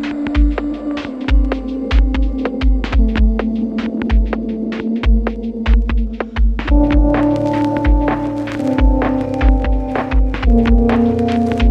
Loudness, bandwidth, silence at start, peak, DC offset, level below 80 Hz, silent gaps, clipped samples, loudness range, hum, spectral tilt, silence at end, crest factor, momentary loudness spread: -17 LUFS; 5.8 kHz; 0 s; 0 dBFS; under 0.1%; -16 dBFS; none; under 0.1%; 2 LU; none; -8.5 dB/octave; 0 s; 14 dB; 7 LU